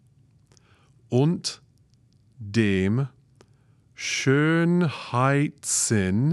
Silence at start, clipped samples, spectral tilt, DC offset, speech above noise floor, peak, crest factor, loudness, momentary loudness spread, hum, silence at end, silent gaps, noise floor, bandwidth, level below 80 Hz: 1.1 s; under 0.1%; -5 dB/octave; under 0.1%; 37 dB; -8 dBFS; 18 dB; -23 LUFS; 11 LU; none; 0 s; none; -60 dBFS; 13 kHz; -68 dBFS